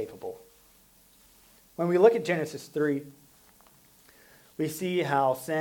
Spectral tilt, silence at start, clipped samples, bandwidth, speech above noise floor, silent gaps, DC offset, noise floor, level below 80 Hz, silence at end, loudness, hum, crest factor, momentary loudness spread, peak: -6 dB/octave; 0 s; under 0.1%; 19 kHz; 34 dB; none; under 0.1%; -60 dBFS; -72 dBFS; 0 s; -27 LUFS; none; 22 dB; 20 LU; -8 dBFS